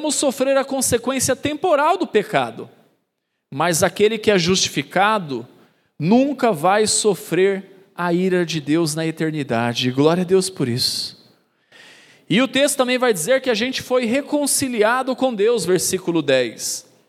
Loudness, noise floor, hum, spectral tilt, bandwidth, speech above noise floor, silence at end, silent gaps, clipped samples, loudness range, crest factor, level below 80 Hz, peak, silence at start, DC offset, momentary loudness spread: -19 LUFS; -74 dBFS; none; -3.5 dB/octave; 16 kHz; 56 dB; 0.25 s; none; under 0.1%; 2 LU; 18 dB; -60 dBFS; -2 dBFS; 0 s; under 0.1%; 7 LU